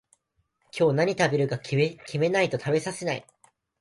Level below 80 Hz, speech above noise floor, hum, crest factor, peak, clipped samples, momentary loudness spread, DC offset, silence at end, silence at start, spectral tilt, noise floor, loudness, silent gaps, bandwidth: -66 dBFS; 48 dB; none; 18 dB; -8 dBFS; under 0.1%; 8 LU; under 0.1%; 0.6 s; 0.75 s; -5.5 dB/octave; -73 dBFS; -26 LUFS; none; 11.5 kHz